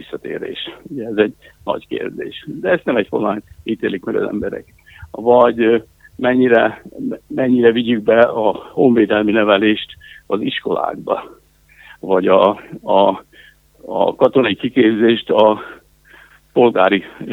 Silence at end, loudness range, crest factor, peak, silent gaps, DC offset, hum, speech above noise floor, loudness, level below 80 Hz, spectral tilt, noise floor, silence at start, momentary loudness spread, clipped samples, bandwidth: 0 s; 6 LU; 16 dB; 0 dBFS; none; under 0.1%; none; 32 dB; -16 LUFS; -54 dBFS; -7.5 dB/octave; -48 dBFS; 0 s; 14 LU; under 0.1%; 5.8 kHz